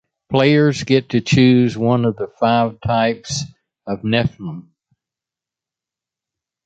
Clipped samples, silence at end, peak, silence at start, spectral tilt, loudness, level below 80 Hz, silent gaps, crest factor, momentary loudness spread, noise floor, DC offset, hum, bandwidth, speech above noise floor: under 0.1%; 2.05 s; -2 dBFS; 0.3 s; -6 dB/octave; -17 LUFS; -48 dBFS; none; 16 dB; 17 LU; -87 dBFS; under 0.1%; none; 8.6 kHz; 71 dB